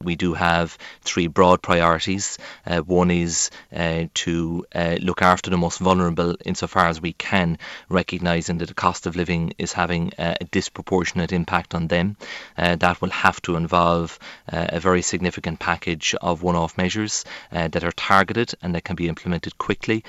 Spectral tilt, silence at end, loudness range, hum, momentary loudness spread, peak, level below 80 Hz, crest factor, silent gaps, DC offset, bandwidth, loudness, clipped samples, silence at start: -4.5 dB/octave; 0 s; 3 LU; none; 9 LU; 0 dBFS; -44 dBFS; 22 dB; none; under 0.1%; 9.4 kHz; -22 LUFS; under 0.1%; 0 s